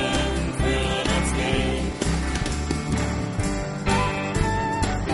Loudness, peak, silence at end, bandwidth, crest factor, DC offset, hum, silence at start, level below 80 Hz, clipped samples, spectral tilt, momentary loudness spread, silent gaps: -24 LUFS; -8 dBFS; 0 s; 11.5 kHz; 16 dB; under 0.1%; none; 0 s; -30 dBFS; under 0.1%; -5 dB/octave; 4 LU; none